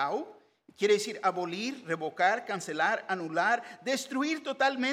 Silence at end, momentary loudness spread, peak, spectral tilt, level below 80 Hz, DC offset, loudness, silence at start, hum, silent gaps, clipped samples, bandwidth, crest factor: 0 s; 8 LU; -12 dBFS; -3.5 dB/octave; -88 dBFS; under 0.1%; -30 LUFS; 0 s; none; none; under 0.1%; 15.5 kHz; 18 dB